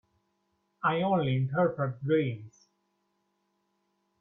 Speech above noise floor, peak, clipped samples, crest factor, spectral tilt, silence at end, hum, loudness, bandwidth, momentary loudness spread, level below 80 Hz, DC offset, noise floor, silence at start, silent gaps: 49 dB; -14 dBFS; under 0.1%; 18 dB; -9 dB/octave; 1.75 s; none; -29 LUFS; 6.4 kHz; 7 LU; -70 dBFS; under 0.1%; -77 dBFS; 0.85 s; none